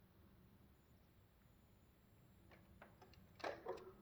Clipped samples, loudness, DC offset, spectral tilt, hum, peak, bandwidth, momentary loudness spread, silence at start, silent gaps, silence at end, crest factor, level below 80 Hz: under 0.1%; -54 LUFS; under 0.1%; -5 dB/octave; none; -34 dBFS; over 20 kHz; 19 LU; 0 s; none; 0 s; 24 dB; -76 dBFS